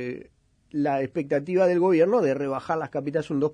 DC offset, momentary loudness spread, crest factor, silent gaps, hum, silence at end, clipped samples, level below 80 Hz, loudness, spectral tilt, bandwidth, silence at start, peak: under 0.1%; 9 LU; 14 dB; none; none; 0 s; under 0.1%; -64 dBFS; -24 LUFS; -8 dB/octave; 10 kHz; 0 s; -10 dBFS